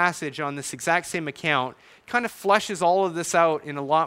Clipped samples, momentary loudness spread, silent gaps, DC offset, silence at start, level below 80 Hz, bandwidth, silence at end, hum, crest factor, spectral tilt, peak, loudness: under 0.1%; 8 LU; none; under 0.1%; 0 s; -66 dBFS; 16 kHz; 0 s; none; 20 dB; -3.5 dB/octave; -4 dBFS; -24 LUFS